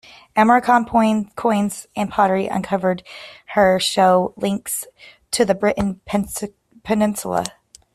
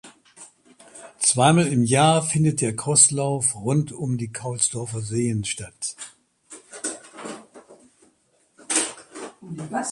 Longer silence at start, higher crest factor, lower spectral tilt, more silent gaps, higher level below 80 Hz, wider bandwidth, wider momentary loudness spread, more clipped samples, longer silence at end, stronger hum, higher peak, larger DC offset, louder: first, 0.35 s vs 0.05 s; second, 16 dB vs 22 dB; about the same, -4.5 dB/octave vs -4 dB/octave; neither; first, -50 dBFS vs -58 dBFS; first, 14.5 kHz vs 11.5 kHz; second, 13 LU vs 21 LU; neither; first, 0.45 s vs 0 s; neither; about the same, -2 dBFS vs -2 dBFS; neither; about the same, -19 LUFS vs -21 LUFS